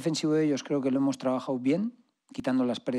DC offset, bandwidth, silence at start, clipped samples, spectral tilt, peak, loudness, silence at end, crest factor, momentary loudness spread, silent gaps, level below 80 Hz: under 0.1%; 11.5 kHz; 0 s; under 0.1%; -6 dB/octave; -14 dBFS; -28 LUFS; 0 s; 14 dB; 7 LU; none; -72 dBFS